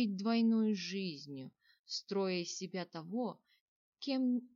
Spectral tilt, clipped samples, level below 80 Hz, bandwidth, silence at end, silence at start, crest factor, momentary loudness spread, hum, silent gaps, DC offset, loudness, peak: -5 dB/octave; under 0.1%; under -90 dBFS; 7.6 kHz; 0.1 s; 0 s; 14 dB; 15 LU; none; 1.79-1.84 s, 3.61-3.92 s; under 0.1%; -37 LUFS; -22 dBFS